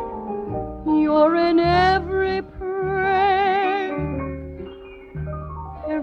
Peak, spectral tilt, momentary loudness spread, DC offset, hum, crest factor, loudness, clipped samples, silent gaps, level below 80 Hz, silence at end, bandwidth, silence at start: -4 dBFS; -7.5 dB/octave; 17 LU; under 0.1%; none; 18 dB; -21 LUFS; under 0.1%; none; -40 dBFS; 0 s; 6.8 kHz; 0 s